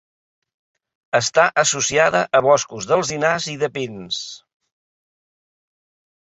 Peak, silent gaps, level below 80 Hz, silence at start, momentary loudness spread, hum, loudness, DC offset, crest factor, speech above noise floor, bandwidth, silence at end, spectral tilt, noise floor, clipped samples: -2 dBFS; none; -60 dBFS; 1.15 s; 11 LU; none; -18 LUFS; under 0.1%; 20 dB; over 71 dB; 8.2 kHz; 1.95 s; -2.5 dB/octave; under -90 dBFS; under 0.1%